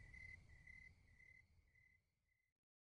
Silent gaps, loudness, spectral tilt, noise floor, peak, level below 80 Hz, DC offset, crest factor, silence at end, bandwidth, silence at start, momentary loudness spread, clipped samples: none; -63 LUFS; -4.5 dB/octave; -88 dBFS; -50 dBFS; -74 dBFS; under 0.1%; 18 dB; 0.3 s; 10 kHz; 0 s; 9 LU; under 0.1%